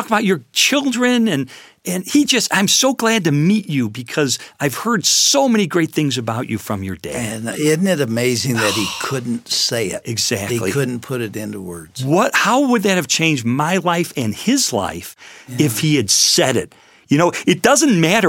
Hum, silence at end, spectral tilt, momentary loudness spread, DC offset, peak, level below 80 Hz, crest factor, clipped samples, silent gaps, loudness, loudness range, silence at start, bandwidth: none; 0 s; -3.5 dB/octave; 12 LU; under 0.1%; 0 dBFS; -56 dBFS; 16 dB; under 0.1%; none; -16 LUFS; 4 LU; 0 s; 17 kHz